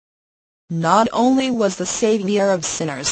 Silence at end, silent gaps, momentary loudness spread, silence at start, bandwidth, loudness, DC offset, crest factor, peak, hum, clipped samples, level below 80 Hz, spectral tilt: 0 s; none; 6 LU; 0.7 s; 8.8 kHz; -18 LUFS; under 0.1%; 18 dB; -2 dBFS; none; under 0.1%; -54 dBFS; -4 dB/octave